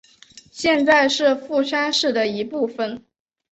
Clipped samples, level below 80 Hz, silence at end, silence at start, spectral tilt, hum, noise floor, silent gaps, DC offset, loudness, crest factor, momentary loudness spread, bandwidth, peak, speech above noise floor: under 0.1%; -62 dBFS; 0.5 s; 0.55 s; -3 dB/octave; none; -48 dBFS; none; under 0.1%; -19 LUFS; 16 dB; 13 LU; 8.2 kHz; -4 dBFS; 29 dB